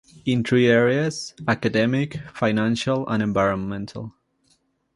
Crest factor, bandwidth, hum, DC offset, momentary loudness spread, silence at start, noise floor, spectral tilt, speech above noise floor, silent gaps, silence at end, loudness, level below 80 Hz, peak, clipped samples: 18 dB; 11.5 kHz; none; under 0.1%; 13 LU; 0.25 s; -65 dBFS; -6 dB/octave; 44 dB; none; 0.85 s; -22 LUFS; -54 dBFS; -4 dBFS; under 0.1%